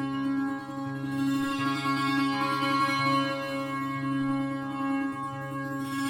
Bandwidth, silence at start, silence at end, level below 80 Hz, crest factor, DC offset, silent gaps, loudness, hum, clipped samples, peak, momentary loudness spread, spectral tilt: 17 kHz; 0 s; 0 s; -64 dBFS; 14 dB; under 0.1%; none; -29 LUFS; none; under 0.1%; -14 dBFS; 8 LU; -5.5 dB/octave